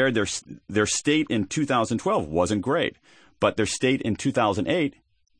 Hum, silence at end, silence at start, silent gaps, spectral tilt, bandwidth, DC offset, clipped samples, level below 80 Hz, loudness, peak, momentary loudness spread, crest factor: none; 0.5 s; 0 s; none; -4.5 dB/octave; 9.8 kHz; under 0.1%; under 0.1%; -54 dBFS; -24 LUFS; -6 dBFS; 5 LU; 18 dB